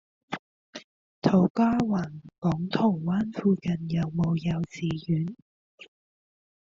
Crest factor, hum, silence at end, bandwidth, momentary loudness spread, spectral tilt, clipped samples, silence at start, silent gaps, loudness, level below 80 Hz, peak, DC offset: 20 dB; none; 0.75 s; 7.4 kHz; 16 LU; -7.5 dB/octave; under 0.1%; 0.3 s; 0.39-0.73 s, 0.84-1.22 s, 1.50-1.55 s, 2.38-2.42 s, 5.42-5.78 s; -27 LUFS; -58 dBFS; -8 dBFS; under 0.1%